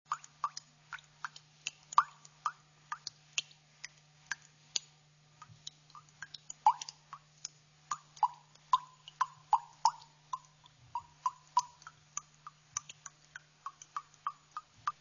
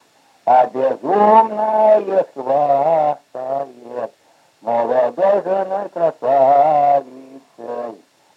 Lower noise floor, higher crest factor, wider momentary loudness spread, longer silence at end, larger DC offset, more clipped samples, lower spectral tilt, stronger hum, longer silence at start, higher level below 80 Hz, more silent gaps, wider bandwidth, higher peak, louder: first, -65 dBFS vs -55 dBFS; first, 30 dB vs 16 dB; first, 22 LU vs 16 LU; second, 0.1 s vs 0.45 s; neither; neither; second, 1.5 dB/octave vs -7 dB/octave; neither; second, 0.1 s vs 0.45 s; first, -82 dBFS vs -88 dBFS; neither; about the same, 7.2 kHz vs 7.6 kHz; second, -10 dBFS vs 0 dBFS; second, -38 LUFS vs -16 LUFS